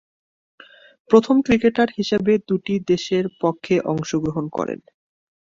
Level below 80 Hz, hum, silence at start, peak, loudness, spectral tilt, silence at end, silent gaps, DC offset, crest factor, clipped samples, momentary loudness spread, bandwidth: -54 dBFS; none; 1.1 s; -2 dBFS; -20 LUFS; -6 dB/octave; 0.7 s; none; under 0.1%; 18 dB; under 0.1%; 9 LU; 7.6 kHz